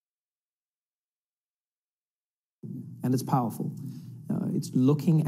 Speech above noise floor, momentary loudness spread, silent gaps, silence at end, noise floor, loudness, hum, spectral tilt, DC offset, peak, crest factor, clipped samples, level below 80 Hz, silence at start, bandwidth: over 64 dB; 18 LU; none; 0 s; under -90 dBFS; -28 LUFS; none; -8 dB/octave; under 0.1%; -12 dBFS; 18 dB; under 0.1%; -82 dBFS; 2.65 s; 16 kHz